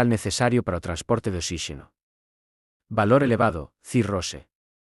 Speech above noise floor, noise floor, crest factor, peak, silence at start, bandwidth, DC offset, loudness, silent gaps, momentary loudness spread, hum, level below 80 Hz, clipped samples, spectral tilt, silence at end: over 67 dB; under -90 dBFS; 18 dB; -6 dBFS; 0 s; 12 kHz; under 0.1%; -24 LUFS; 2.03-2.80 s; 14 LU; none; -50 dBFS; under 0.1%; -5.5 dB/octave; 0.45 s